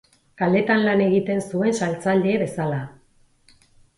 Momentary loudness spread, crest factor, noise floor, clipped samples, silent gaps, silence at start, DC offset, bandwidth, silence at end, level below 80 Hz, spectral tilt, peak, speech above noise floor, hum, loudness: 8 LU; 16 dB; -58 dBFS; under 0.1%; none; 0.4 s; under 0.1%; 11.5 kHz; 1.05 s; -60 dBFS; -6.5 dB/octave; -6 dBFS; 38 dB; none; -21 LUFS